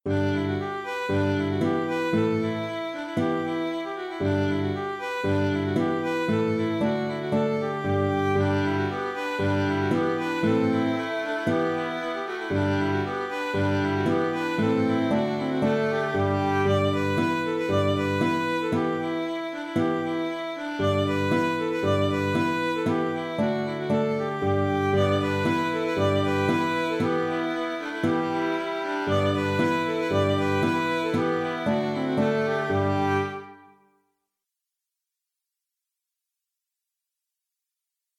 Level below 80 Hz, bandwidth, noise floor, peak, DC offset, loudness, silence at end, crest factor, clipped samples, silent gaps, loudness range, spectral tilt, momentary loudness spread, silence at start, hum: -64 dBFS; 15 kHz; -86 dBFS; -10 dBFS; under 0.1%; -25 LUFS; 4.6 s; 14 dB; under 0.1%; none; 2 LU; -7 dB/octave; 5 LU; 0.05 s; none